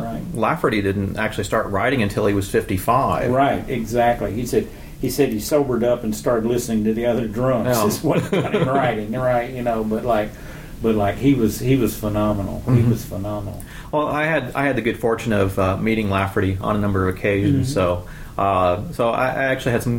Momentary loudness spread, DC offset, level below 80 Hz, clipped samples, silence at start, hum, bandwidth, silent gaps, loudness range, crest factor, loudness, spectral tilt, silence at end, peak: 6 LU; under 0.1%; -38 dBFS; under 0.1%; 0 s; none; 17 kHz; none; 1 LU; 16 dB; -20 LUFS; -6.5 dB/octave; 0 s; -4 dBFS